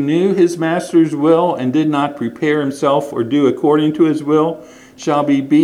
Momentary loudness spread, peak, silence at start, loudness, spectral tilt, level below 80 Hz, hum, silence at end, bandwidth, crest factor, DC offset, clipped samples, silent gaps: 5 LU; 0 dBFS; 0 s; -15 LUFS; -6.5 dB/octave; -62 dBFS; none; 0 s; 12 kHz; 14 dB; under 0.1%; under 0.1%; none